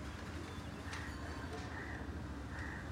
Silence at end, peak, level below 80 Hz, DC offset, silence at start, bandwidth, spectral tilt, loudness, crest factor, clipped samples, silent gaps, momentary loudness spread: 0 s; -32 dBFS; -52 dBFS; under 0.1%; 0 s; 16 kHz; -5.5 dB/octave; -46 LUFS; 12 dB; under 0.1%; none; 2 LU